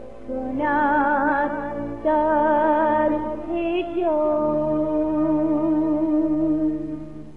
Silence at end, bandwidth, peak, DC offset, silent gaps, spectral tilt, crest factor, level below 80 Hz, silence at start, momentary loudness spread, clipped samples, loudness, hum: 0 s; 4.2 kHz; -8 dBFS; 0.9%; none; -9 dB/octave; 12 dB; -48 dBFS; 0 s; 9 LU; under 0.1%; -22 LUFS; none